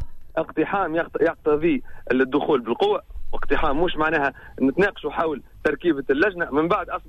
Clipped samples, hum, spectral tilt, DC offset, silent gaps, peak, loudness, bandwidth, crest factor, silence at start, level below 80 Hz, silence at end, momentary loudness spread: under 0.1%; none; -7 dB/octave; under 0.1%; none; -6 dBFS; -23 LUFS; 6 kHz; 16 dB; 0 s; -36 dBFS; 0 s; 6 LU